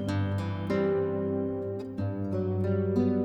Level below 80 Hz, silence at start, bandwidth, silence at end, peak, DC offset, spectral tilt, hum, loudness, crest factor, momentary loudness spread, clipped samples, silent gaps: -60 dBFS; 0 s; 8.6 kHz; 0 s; -16 dBFS; under 0.1%; -9 dB/octave; none; -30 LUFS; 14 dB; 7 LU; under 0.1%; none